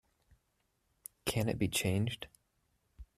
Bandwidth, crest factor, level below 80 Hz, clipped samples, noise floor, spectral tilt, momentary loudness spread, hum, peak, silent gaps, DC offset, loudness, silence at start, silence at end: 14.5 kHz; 22 dB; -60 dBFS; under 0.1%; -79 dBFS; -4.5 dB/octave; 20 LU; none; -18 dBFS; none; under 0.1%; -35 LUFS; 1.25 s; 0.15 s